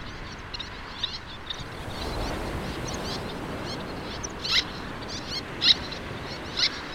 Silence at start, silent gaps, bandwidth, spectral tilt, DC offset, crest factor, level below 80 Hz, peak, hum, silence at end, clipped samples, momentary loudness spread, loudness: 0 s; none; 16 kHz; -3 dB/octave; under 0.1%; 24 dB; -44 dBFS; -8 dBFS; none; 0 s; under 0.1%; 13 LU; -29 LUFS